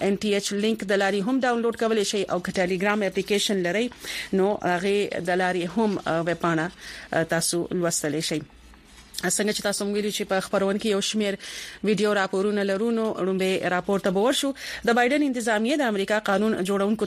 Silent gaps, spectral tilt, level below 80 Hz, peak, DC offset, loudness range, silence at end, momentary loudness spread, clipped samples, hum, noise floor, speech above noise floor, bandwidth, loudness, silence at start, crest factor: none; -4 dB/octave; -58 dBFS; -8 dBFS; under 0.1%; 3 LU; 0 s; 5 LU; under 0.1%; none; -49 dBFS; 25 dB; 15 kHz; -24 LUFS; 0 s; 16 dB